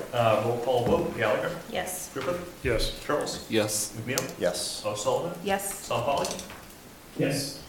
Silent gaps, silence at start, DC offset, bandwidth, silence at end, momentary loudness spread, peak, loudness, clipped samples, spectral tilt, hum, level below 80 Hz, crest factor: none; 0 s; under 0.1%; 17.5 kHz; 0 s; 8 LU; -4 dBFS; -28 LUFS; under 0.1%; -4 dB/octave; none; -46 dBFS; 24 dB